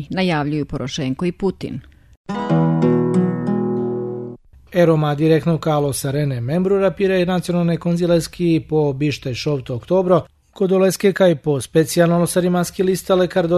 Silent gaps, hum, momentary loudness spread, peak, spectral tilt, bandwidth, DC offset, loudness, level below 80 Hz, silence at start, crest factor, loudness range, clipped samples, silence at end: 2.17-2.24 s; none; 8 LU; -2 dBFS; -6.5 dB/octave; 13.5 kHz; under 0.1%; -18 LUFS; -46 dBFS; 0 s; 16 dB; 3 LU; under 0.1%; 0 s